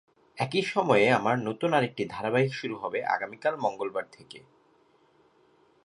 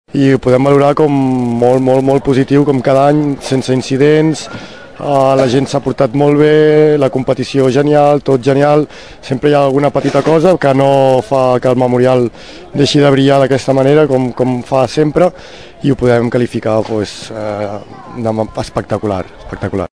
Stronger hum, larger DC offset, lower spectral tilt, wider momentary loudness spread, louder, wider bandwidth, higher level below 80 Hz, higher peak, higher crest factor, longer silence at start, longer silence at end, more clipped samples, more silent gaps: neither; second, under 0.1% vs 0.9%; about the same, -6 dB/octave vs -7 dB/octave; about the same, 13 LU vs 11 LU; second, -27 LUFS vs -11 LUFS; about the same, 11 kHz vs 11 kHz; second, -70 dBFS vs -42 dBFS; second, -8 dBFS vs 0 dBFS; first, 22 dB vs 12 dB; first, 0.35 s vs 0.15 s; first, 1.45 s vs 0.05 s; second, under 0.1% vs 0.9%; neither